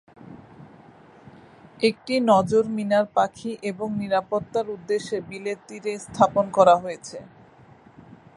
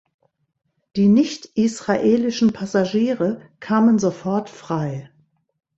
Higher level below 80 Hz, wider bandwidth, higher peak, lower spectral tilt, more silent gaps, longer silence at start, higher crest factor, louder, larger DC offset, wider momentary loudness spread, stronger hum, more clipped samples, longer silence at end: about the same, -62 dBFS vs -60 dBFS; first, 11.5 kHz vs 8 kHz; about the same, -2 dBFS vs -4 dBFS; about the same, -5.5 dB/octave vs -6.5 dB/octave; neither; second, 0.25 s vs 0.95 s; first, 22 dB vs 16 dB; second, -23 LUFS vs -20 LUFS; neither; first, 14 LU vs 11 LU; neither; neither; first, 1.1 s vs 0.7 s